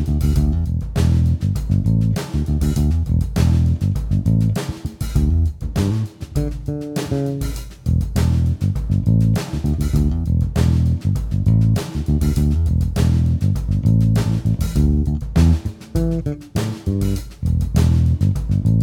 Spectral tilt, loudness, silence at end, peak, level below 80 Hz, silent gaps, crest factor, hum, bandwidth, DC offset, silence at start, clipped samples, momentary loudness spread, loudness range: -7.5 dB/octave; -19 LUFS; 0 s; -4 dBFS; -24 dBFS; none; 14 dB; none; 16.5 kHz; under 0.1%; 0 s; under 0.1%; 8 LU; 4 LU